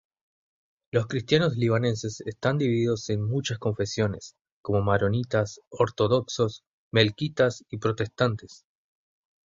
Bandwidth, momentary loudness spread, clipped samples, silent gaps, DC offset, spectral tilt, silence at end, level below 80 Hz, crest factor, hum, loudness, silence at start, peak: 7.8 kHz; 8 LU; under 0.1%; 4.41-4.45 s, 4.52-4.64 s, 5.67-5.71 s, 6.67-6.91 s; under 0.1%; -6 dB/octave; 0.9 s; -54 dBFS; 24 dB; none; -26 LUFS; 0.95 s; -4 dBFS